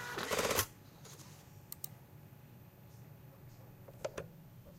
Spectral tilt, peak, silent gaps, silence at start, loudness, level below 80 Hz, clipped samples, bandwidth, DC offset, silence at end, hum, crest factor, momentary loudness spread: -2.5 dB/octave; -16 dBFS; none; 0 s; -39 LUFS; -64 dBFS; under 0.1%; 16.5 kHz; under 0.1%; 0 s; none; 28 dB; 23 LU